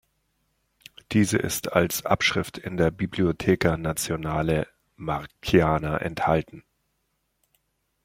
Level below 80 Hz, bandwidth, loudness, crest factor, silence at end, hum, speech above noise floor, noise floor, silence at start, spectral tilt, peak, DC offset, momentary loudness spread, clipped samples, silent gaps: -48 dBFS; 16.5 kHz; -25 LUFS; 22 dB; 1.45 s; none; 50 dB; -74 dBFS; 1.1 s; -5 dB/octave; -4 dBFS; under 0.1%; 9 LU; under 0.1%; none